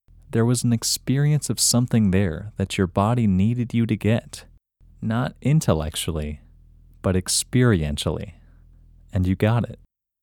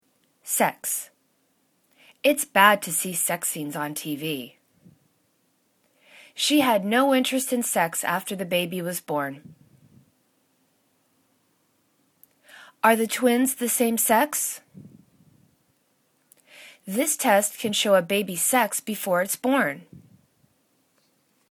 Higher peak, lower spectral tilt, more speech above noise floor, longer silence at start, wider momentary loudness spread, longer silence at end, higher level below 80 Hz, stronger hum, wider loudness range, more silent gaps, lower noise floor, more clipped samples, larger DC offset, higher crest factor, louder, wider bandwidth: about the same, -4 dBFS vs -2 dBFS; first, -5 dB/octave vs -2.5 dB/octave; second, 31 dB vs 45 dB; second, 0.3 s vs 0.45 s; about the same, 11 LU vs 10 LU; second, 0.5 s vs 1.5 s; first, -42 dBFS vs -74 dBFS; neither; second, 4 LU vs 7 LU; neither; second, -52 dBFS vs -68 dBFS; neither; neither; second, 20 dB vs 26 dB; about the same, -22 LUFS vs -23 LUFS; about the same, 18.5 kHz vs 19 kHz